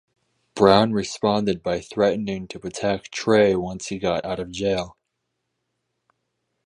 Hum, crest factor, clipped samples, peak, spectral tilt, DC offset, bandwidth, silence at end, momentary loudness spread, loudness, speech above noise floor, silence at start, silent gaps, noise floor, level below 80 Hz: none; 22 dB; under 0.1%; 0 dBFS; -5 dB/octave; under 0.1%; 11 kHz; 1.75 s; 13 LU; -22 LUFS; 56 dB; 0.55 s; none; -78 dBFS; -52 dBFS